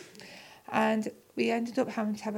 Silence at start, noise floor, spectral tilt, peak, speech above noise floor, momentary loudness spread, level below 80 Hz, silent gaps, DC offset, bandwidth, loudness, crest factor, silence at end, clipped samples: 0 s; -50 dBFS; -5.5 dB/octave; -12 dBFS; 20 dB; 19 LU; -78 dBFS; none; under 0.1%; 16 kHz; -31 LUFS; 20 dB; 0 s; under 0.1%